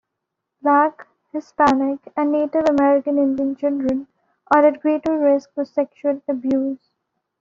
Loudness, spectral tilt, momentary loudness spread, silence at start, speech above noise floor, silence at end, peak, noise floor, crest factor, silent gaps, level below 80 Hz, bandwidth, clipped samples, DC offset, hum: -19 LUFS; -4.5 dB/octave; 9 LU; 0.65 s; 61 dB; 0.65 s; -2 dBFS; -80 dBFS; 18 dB; none; -58 dBFS; 7.4 kHz; under 0.1%; under 0.1%; none